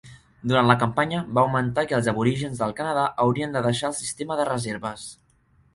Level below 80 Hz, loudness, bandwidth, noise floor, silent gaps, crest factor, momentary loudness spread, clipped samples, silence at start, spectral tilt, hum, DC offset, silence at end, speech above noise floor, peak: -56 dBFS; -24 LUFS; 11.5 kHz; -61 dBFS; none; 22 dB; 10 LU; under 0.1%; 0.05 s; -5.5 dB/octave; none; under 0.1%; 0.6 s; 38 dB; -2 dBFS